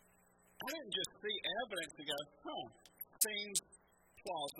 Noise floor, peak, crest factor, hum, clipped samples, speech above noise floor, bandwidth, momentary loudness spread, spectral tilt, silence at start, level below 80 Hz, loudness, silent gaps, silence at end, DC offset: -70 dBFS; -16 dBFS; 28 dB; none; under 0.1%; 27 dB; 16.5 kHz; 14 LU; -0.5 dB/octave; 0.6 s; -78 dBFS; -40 LUFS; none; 0 s; under 0.1%